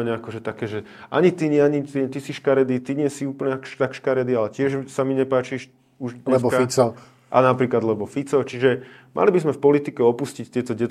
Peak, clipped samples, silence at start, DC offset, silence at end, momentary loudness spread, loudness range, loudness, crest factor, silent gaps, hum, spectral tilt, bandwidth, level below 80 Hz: -2 dBFS; under 0.1%; 0 s; under 0.1%; 0 s; 11 LU; 3 LU; -22 LUFS; 20 dB; none; none; -6.5 dB/octave; 13.5 kHz; -66 dBFS